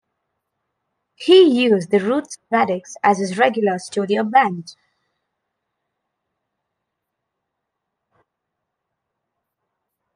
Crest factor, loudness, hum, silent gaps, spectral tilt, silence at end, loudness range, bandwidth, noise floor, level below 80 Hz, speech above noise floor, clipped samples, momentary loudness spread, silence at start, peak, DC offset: 20 dB; -17 LUFS; none; none; -5 dB/octave; 5.45 s; 7 LU; 10.5 kHz; -79 dBFS; -72 dBFS; 62 dB; under 0.1%; 11 LU; 1.2 s; -2 dBFS; under 0.1%